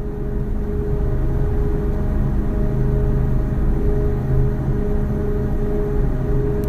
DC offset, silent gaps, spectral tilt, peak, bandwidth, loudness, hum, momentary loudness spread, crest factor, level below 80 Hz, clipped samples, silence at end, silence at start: under 0.1%; none; -10 dB/octave; -6 dBFS; 3.9 kHz; -22 LUFS; none; 3 LU; 12 dB; -20 dBFS; under 0.1%; 0 s; 0 s